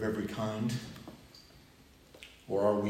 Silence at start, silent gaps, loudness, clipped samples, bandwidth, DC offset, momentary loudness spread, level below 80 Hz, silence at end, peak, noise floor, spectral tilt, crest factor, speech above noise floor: 0 s; none; -35 LUFS; under 0.1%; 16 kHz; under 0.1%; 23 LU; -64 dBFS; 0 s; -16 dBFS; -59 dBFS; -6.5 dB/octave; 18 dB; 27 dB